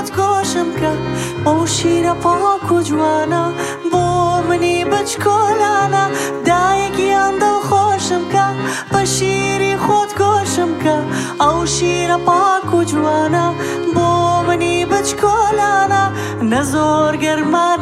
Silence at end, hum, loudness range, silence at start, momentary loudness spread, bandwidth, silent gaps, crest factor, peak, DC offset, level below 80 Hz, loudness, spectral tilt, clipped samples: 0 s; none; 1 LU; 0 s; 4 LU; 15 kHz; none; 14 dB; -2 dBFS; under 0.1%; -42 dBFS; -15 LUFS; -4.5 dB/octave; under 0.1%